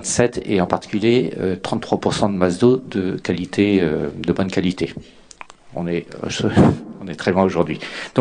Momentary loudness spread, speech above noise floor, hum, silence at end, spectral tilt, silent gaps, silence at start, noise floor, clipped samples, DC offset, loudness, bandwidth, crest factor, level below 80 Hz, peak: 10 LU; 23 dB; none; 0 s; -5.5 dB/octave; none; 0 s; -41 dBFS; under 0.1%; under 0.1%; -20 LUFS; 10 kHz; 20 dB; -44 dBFS; 0 dBFS